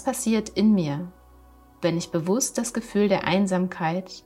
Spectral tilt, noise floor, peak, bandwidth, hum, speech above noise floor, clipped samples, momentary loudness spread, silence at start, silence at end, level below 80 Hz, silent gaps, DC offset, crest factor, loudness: -5 dB/octave; -52 dBFS; -6 dBFS; 13.5 kHz; none; 28 dB; under 0.1%; 7 LU; 0 s; 0.05 s; -54 dBFS; none; under 0.1%; 18 dB; -24 LUFS